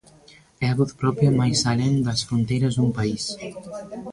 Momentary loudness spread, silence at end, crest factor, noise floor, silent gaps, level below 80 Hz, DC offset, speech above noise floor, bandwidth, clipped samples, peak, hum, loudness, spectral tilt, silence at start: 15 LU; 0 s; 16 dB; -52 dBFS; none; -50 dBFS; under 0.1%; 30 dB; 11.5 kHz; under 0.1%; -6 dBFS; none; -22 LUFS; -5.5 dB/octave; 0.6 s